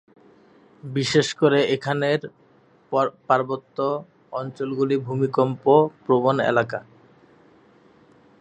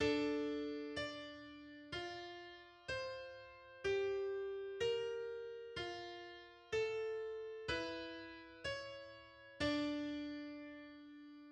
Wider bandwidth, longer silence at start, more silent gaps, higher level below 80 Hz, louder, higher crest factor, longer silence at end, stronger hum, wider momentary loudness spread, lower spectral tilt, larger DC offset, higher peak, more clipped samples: about the same, 10.5 kHz vs 10 kHz; first, 0.85 s vs 0 s; neither; about the same, -68 dBFS vs -68 dBFS; first, -22 LUFS vs -44 LUFS; about the same, 20 dB vs 18 dB; first, 1.6 s vs 0 s; neither; second, 13 LU vs 16 LU; first, -6 dB/octave vs -4.5 dB/octave; neither; first, -4 dBFS vs -26 dBFS; neither